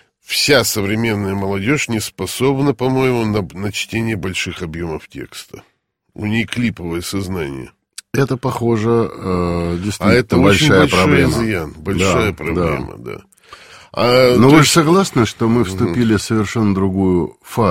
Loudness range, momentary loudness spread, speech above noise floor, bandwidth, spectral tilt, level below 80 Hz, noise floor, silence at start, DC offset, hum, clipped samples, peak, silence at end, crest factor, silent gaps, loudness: 10 LU; 14 LU; 26 dB; 16.5 kHz; -5 dB/octave; -40 dBFS; -41 dBFS; 0.3 s; under 0.1%; none; under 0.1%; 0 dBFS; 0 s; 16 dB; none; -16 LUFS